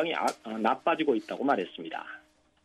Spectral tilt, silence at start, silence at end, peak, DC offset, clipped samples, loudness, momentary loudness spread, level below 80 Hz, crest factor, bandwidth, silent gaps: -4.5 dB/octave; 0 s; 0.45 s; -12 dBFS; under 0.1%; under 0.1%; -30 LUFS; 13 LU; -78 dBFS; 18 dB; 13 kHz; none